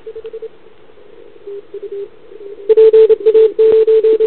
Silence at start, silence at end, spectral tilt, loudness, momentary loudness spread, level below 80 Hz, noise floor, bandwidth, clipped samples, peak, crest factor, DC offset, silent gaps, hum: 0.05 s; 0 s; -9.5 dB/octave; -9 LUFS; 24 LU; -56 dBFS; -44 dBFS; 4.2 kHz; under 0.1%; 0 dBFS; 12 dB; 1%; none; none